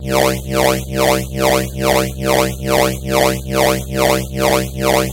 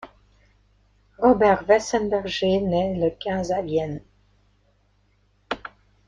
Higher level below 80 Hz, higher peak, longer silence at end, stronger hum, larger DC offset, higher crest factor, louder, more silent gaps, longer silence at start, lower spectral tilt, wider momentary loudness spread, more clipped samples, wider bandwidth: first, -30 dBFS vs -50 dBFS; first, 0 dBFS vs -4 dBFS; second, 0 s vs 0.4 s; second, none vs 50 Hz at -45 dBFS; neither; second, 14 dB vs 20 dB; first, -16 LUFS vs -22 LUFS; neither; about the same, 0 s vs 0 s; second, -4 dB/octave vs -5.5 dB/octave; second, 1 LU vs 15 LU; neither; first, 16 kHz vs 10 kHz